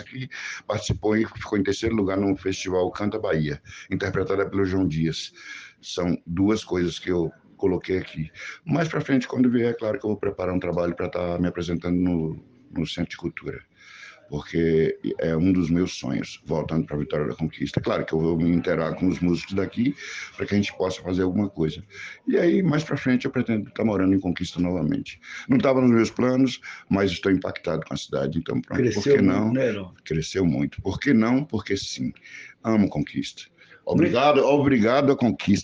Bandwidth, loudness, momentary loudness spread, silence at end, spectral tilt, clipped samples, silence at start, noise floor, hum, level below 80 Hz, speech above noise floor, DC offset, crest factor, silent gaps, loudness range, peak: 8 kHz; -24 LUFS; 13 LU; 0 s; -6.5 dB/octave; under 0.1%; 0 s; -46 dBFS; none; -52 dBFS; 23 dB; under 0.1%; 18 dB; none; 4 LU; -4 dBFS